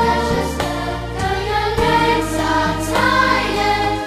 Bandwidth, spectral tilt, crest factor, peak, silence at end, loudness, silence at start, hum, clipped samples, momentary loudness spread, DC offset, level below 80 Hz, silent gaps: 15 kHz; -4.5 dB/octave; 14 dB; -4 dBFS; 0 s; -17 LUFS; 0 s; none; under 0.1%; 7 LU; under 0.1%; -30 dBFS; none